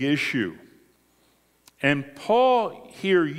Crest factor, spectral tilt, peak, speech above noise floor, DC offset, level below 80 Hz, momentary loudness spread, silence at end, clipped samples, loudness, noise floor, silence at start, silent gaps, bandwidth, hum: 20 dB; -6 dB/octave; -6 dBFS; 40 dB; under 0.1%; -66 dBFS; 12 LU; 0 s; under 0.1%; -24 LUFS; -63 dBFS; 0 s; none; 15.5 kHz; none